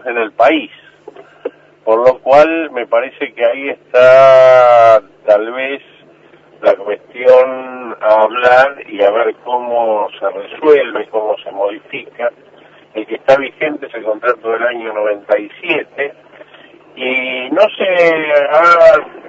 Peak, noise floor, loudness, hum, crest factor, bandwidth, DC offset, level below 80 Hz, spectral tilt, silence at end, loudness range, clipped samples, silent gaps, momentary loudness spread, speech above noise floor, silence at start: 0 dBFS; -44 dBFS; -12 LUFS; none; 12 dB; 7.6 kHz; under 0.1%; -56 dBFS; -5 dB/octave; 0 s; 9 LU; 0.4%; none; 16 LU; 33 dB; 0.05 s